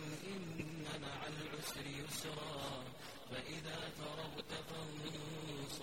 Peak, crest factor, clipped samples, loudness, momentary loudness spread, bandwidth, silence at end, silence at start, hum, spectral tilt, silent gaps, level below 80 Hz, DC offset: -30 dBFS; 16 dB; under 0.1%; -46 LUFS; 3 LU; 16 kHz; 0 s; 0 s; none; -4 dB/octave; none; -68 dBFS; under 0.1%